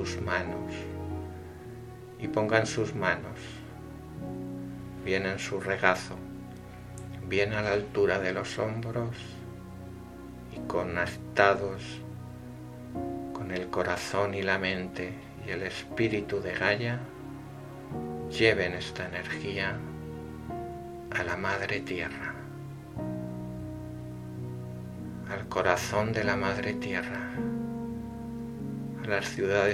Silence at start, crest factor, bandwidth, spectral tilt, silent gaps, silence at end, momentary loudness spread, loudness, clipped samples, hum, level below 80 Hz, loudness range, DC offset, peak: 0 s; 28 dB; 16.5 kHz; -5.5 dB/octave; none; 0 s; 17 LU; -31 LUFS; under 0.1%; none; -54 dBFS; 4 LU; under 0.1%; -4 dBFS